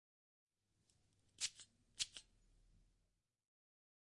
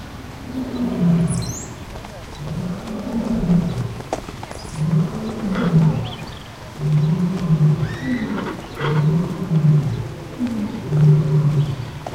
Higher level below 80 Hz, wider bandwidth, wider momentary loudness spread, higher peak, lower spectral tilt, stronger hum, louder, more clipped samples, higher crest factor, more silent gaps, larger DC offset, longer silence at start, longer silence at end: second, -80 dBFS vs -40 dBFS; about the same, 12 kHz vs 11 kHz; about the same, 16 LU vs 16 LU; second, -24 dBFS vs -4 dBFS; second, 2 dB/octave vs -7.5 dB/octave; neither; second, -46 LUFS vs -20 LUFS; neither; first, 32 dB vs 16 dB; neither; neither; first, 1.4 s vs 0 s; first, 1.85 s vs 0 s